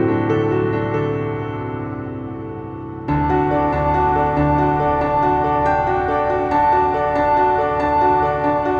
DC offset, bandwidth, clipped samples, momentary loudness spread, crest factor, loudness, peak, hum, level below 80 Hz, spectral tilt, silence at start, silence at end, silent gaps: under 0.1%; 7 kHz; under 0.1%; 12 LU; 14 dB; -18 LUFS; -4 dBFS; none; -34 dBFS; -9 dB/octave; 0 s; 0 s; none